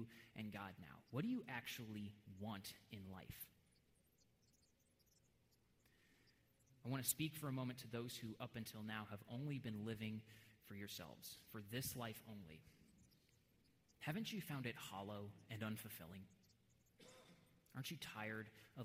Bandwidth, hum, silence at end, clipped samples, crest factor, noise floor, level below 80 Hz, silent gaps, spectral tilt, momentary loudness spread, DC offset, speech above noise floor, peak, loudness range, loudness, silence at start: 16 kHz; none; 0 s; under 0.1%; 26 dB; -79 dBFS; -80 dBFS; none; -4.5 dB/octave; 14 LU; under 0.1%; 28 dB; -26 dBFS; 10 LU; -50 LUFS; 0 s